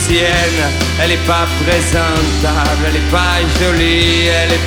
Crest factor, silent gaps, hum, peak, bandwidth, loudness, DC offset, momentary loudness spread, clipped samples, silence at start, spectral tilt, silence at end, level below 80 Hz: 12 dB; none; none; 0 dBFS; over 20 kHz; -12 LUFS; under 0.1%; 3 LU; under 0.1%; 0 s; -4 dB/octave; 0 s; -20 dBFS